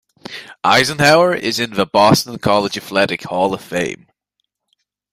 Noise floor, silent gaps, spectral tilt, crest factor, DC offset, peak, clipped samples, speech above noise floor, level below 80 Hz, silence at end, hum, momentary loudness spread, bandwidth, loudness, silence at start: -74 dBFS; none; -4 dB/octave; 16 dB; under 0.1%; 0 dBFS; under 0.1%; 58 dB; -52 dBFS; 1.2 s; none; 14 LU; 16 kHz; -15 LUFS; 0.3 s